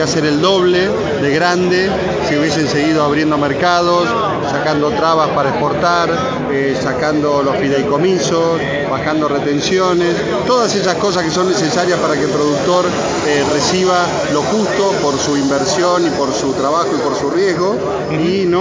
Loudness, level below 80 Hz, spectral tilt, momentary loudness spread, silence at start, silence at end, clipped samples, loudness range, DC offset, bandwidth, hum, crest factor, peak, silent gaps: -14 LUFS; -42 dBFS; -4.5 dB/octave; 3 LU; 0 s; 0 s; under 0.1%; 1 LU; under 0.1%; 7.6 kHz; none; 14 dB; 0 dBFS; none